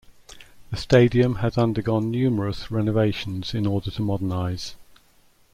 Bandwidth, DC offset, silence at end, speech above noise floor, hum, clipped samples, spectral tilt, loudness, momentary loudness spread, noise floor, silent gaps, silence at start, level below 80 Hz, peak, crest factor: 13 kHz; under 0.1%; 0.7 s; 35 dB; none; under 0.1%; -7.5 dB/octave; -23 LUFS; 11 LU; -57 dBFS; none; 0.3 s; -46 dBFS; -4 dBFS; 18 dB